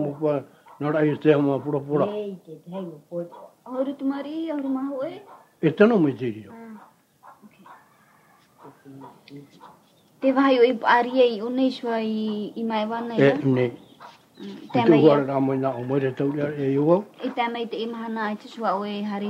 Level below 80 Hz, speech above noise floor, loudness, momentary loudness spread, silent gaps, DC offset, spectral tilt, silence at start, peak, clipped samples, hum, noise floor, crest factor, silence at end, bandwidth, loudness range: -72 dBFS; 34 dB; -23 LUFS; 17 LU; none; under 0.1%; -8 dB/octave; 0 s; -2 dBFS; under 0.1%; none; -57 dBFS; 22 dB; 0 s; 8.4 kHz; 7 LU